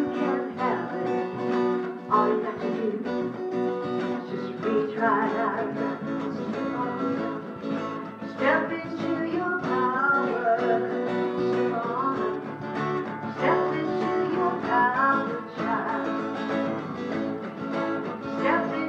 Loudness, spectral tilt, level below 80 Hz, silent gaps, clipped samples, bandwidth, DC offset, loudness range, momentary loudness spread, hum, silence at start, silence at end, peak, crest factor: -27 LUFS; -7.5 dB/octave; -70 dBFS; none; under 0.1%; 7.8 kHz; under 0.1%; 3 LU; 8 LU; none; 0 s; 0 s; -8 dBFS; 18 dB